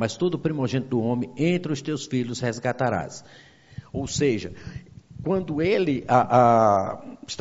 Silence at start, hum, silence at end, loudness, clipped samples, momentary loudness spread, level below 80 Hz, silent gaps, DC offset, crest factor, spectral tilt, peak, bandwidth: 0 s; none; 0 s; -24 LUFS; under 0.1%; 19 LU; -54 dBFS; none; under 0.1%; 20 dB; -5.5 dB/octave; -4 dBFS; 8 kHz